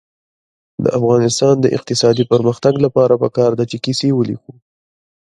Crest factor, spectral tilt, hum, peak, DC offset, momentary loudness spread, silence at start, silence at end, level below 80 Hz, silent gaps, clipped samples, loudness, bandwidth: 16 dB; -6 dB/octave; none; 0 dBFS; under 0.1%; 7 LU; 0.8 s; 0.9 s; -54 dBFS; none; under 0.1%; -15 LUFS; 11.5 kHz